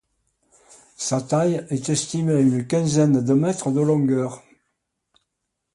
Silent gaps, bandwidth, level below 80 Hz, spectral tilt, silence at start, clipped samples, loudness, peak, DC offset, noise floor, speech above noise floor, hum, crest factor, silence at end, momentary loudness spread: none; 11.5 kHz; -60 dBFS; -6 dB/octave; 1 s; under 0.1%; -21 LUFS; -8 dBFS; under 0.1%; -79 dBFS; 59 dB; none; 14 dB; 1.35 s; 7 LU